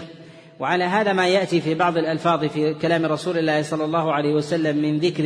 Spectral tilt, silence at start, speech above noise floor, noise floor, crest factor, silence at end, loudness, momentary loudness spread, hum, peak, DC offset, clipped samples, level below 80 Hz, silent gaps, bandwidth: -6 dB/octave; 0 s; 23 dB; -43 dBFS; 16 dB; 0 s; -21 LUFS; 4 LU; none; -6 dBFS; under 0.1%; under 0.1%; -64 dBFS; none; 10.5 kHz